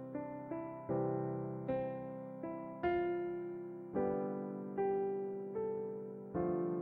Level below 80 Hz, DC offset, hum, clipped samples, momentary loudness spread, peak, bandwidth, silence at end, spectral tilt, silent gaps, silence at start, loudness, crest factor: -68 dBFS; under 0.1%; none; under 0.1%; 9 LU; -24 dBFS; 4 kHz; 0 s; -10.5 dB/octave; none; 0 s; -40 LUFS; 14 dB